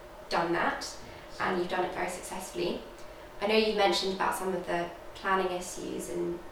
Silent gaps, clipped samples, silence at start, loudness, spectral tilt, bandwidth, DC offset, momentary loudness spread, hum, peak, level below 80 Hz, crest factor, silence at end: none; under 0.1%; 0 s; -31 LUFS; -3.5 dB/octave; over 20 kHz; 0.1%; 13 LU; none; -12 dBFS; -54 dBFS; 20 dB; 0 s